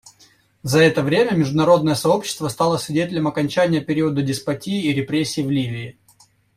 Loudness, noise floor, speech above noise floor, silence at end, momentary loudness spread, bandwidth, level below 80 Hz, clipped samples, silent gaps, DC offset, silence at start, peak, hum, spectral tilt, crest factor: -19 LUFS; -55 dBFS; 36 dB; 0.65 s; 9 LU; 16 kHz; -54 dBFS; under 0.1%; none; under 0.1%; 0.65 s; -2 dBFS; none; -5.5 dB/octave; 18 dB